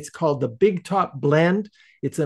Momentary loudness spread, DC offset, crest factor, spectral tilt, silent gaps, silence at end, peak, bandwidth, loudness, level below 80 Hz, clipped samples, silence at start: 11 LU; under 0.1%; 16 dB; -7 dB/octave; none; 0 s; -6 dBFS; 12.5 kHz; -22 LUFS; -64 dBFS; under 0.1%; 0 s